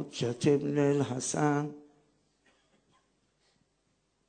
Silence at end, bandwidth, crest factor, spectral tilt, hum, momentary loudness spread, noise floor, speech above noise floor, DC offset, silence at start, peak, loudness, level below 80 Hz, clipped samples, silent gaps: 2.5 s; 9.4 kHz; 20 dB; -5.5 dB/octave; none; 7 LU; -75 dBFS; 46 dB; under 0.1%; 0 s; -14 dBFS; -30 LUFS; -72 dBFS; under 0.1%; none